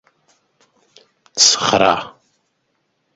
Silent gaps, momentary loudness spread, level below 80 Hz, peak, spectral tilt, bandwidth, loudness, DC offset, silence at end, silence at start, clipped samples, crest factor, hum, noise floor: none; 18 LU; -56 dBFS; 0 dBFS; -1 dB/octave; 16 kHz; -13 LUFS; under 0.1%; 1.05 s; 1.35 s; under 0.1%; 20 dB; none; -68 dBFS